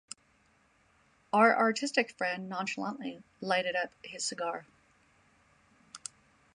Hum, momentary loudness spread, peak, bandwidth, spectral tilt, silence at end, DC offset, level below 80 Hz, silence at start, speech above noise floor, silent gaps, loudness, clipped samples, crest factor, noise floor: none; 20 LU; -10 dBFS; 11.5 kHz; -3 dB/octave; 0.6 s; under 0.1%; -78 dBFS; 1.35 s; 37 dB; none; -31 LUFS; under 0.1%; 24 dB; -68 dBFS